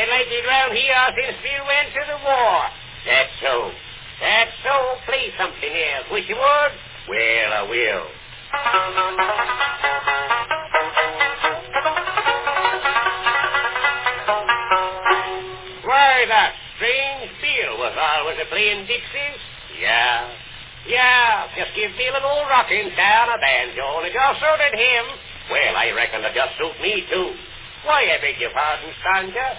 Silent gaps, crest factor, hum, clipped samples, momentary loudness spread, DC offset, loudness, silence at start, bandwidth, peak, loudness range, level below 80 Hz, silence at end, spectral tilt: none; 18 dB; none; under 0.1%; 10 LU; under 0.1%; -18 LUFS; 0 s; 4 kHz; -2 dBFS; 3 LU; -50 dBFS; 0 s; -5.5 dB/octave